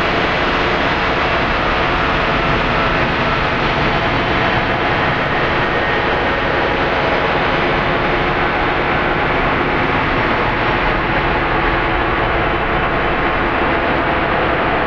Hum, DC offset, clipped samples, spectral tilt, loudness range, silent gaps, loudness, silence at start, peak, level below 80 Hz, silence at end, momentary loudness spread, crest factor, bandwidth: none; under 0.1%; under 0.1%; -6.5 dB/octave; 1 LU; none; -15 LUFS; 0 s; -2 dBFS; -28 dBFS; 0 s; 1 LU; 14 dB; 7.8 kHz